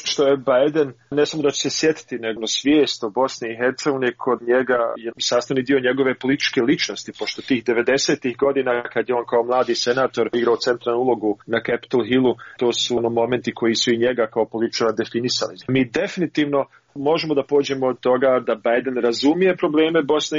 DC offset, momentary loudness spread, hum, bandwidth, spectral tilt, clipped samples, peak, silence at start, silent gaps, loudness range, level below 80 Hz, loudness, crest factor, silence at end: under 0.1%; 5 LU; none; 7.6 kHz; -3 dB/octave; under 0.1%; -6 dBFS; 0 s; none; 1 LU; -62 dBFS; -20 LUFS; 14 dB; 0 s